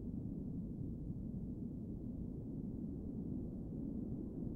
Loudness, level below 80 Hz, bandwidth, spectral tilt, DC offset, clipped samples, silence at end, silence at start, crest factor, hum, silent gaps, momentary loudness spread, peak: -46 LUFS; -54 dBFS; 1.8 kHz; -12.5 dB/octave; under 0.1%; under 0.1%; 0 s; 0 s; 14 dB; none; none; 2 LU; -32 dBFS